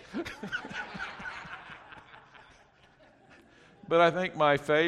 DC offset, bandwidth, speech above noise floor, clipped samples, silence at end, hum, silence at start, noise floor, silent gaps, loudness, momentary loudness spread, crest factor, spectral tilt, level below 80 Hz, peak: under 0.1%; 12.5 kHz; 34 dB; under 0.1%; 0 s; none; 0.05 s; -60 dBFS; none; -29 LUFS; 23 LU; 20 dB; -5.5 dB/octave; -64 dBFS; -12 dBFS